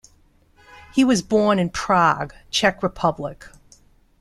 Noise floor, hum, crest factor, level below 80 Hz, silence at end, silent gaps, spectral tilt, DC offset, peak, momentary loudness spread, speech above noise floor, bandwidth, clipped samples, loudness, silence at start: -57 dBFS; none; 20 dB; -48 dBFS; 0.7 s; none; -4.5 dB/octave; under 0.1%; -2 dBFS; 8 LU; 37 dB; 13 kHz; under 0.1%; -20 LUFS; 0.95 s